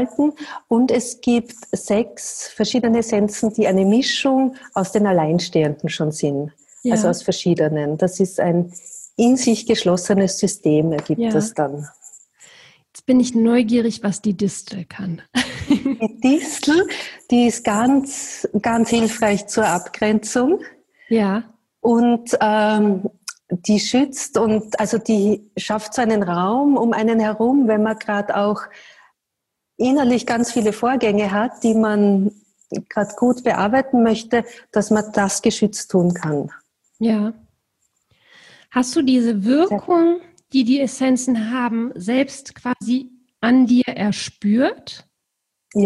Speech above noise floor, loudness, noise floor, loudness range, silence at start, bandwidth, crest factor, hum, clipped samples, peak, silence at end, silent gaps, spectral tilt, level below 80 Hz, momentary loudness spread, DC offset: 61 dB; -19 LUFS; -79 dBFS; 2 LU; 0 s; 12.5 kHz; 14 dB; none; under 0.1%; -6 dBFS; 0 s; none; -5 dB/octave; -56 dBFS; 9 LU; under 0.1%